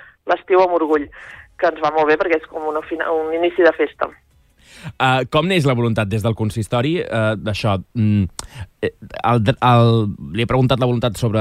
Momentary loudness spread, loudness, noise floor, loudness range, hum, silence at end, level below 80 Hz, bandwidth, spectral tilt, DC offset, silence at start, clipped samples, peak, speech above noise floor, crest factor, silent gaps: 11 LU; -18 LUFS; -50 dBFS; 2 LU; none; 0 s; -44 dBFS; 13.5 kHz; -7 dB/octave; under 0.1%; 0.25 s; under 0.1%; -2 dBFS; 32 dB; 16 dB; none